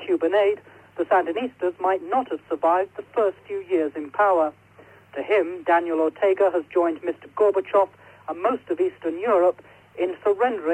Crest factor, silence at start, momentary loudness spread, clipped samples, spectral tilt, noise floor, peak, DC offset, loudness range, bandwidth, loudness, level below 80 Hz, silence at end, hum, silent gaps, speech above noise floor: 14 dB; 0 s; 11 LU; under 0.1%; -6 dB/octave; -51 dBFS; -8 dBFS; under 0.1%; 2 LU; 9.2 kHz; -23 LUFS; -70 dBFS; 0 s; none; none; 28 dB